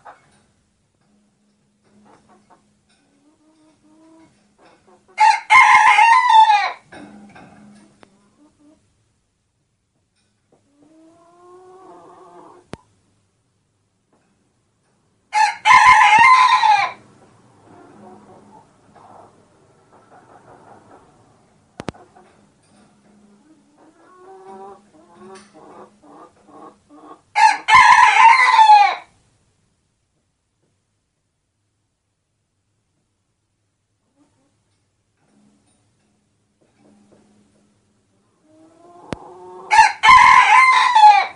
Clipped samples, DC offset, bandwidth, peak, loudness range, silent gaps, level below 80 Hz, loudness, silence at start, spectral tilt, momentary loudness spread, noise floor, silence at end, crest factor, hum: under 0.1%; under 0.1%; 11 kHz; 0 dBFS; 11 LU; none; -56 dBFS; -11 LUFS; 5.2 s; -0.5 dB/octave; 26 LU; -72 dBFS; 0.05 s; 18 dB; none